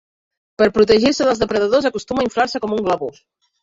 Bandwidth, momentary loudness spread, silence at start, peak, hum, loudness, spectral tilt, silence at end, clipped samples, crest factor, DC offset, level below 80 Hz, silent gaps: 7.8 kHz; 8 LU; 0.6 s; -2 dBFS; none; -17 LUFS; -4.5 dB/octave; 0.5 s; under 0.1%; 16 dB; under 0.1%; -48 dBFS; none